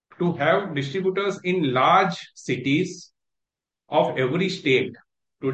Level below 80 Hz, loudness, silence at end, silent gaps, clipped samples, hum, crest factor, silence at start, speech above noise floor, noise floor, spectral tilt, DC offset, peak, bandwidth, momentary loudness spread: -68 dBFS; -23 LUFS; 0 s; none; under 0.1%; none; 18 dB; 0.2 s; 64 dB; -86 dBFS; -6 dB/octave; under 0.1%; -4 dBFS; 8.6 kHz; 12 LU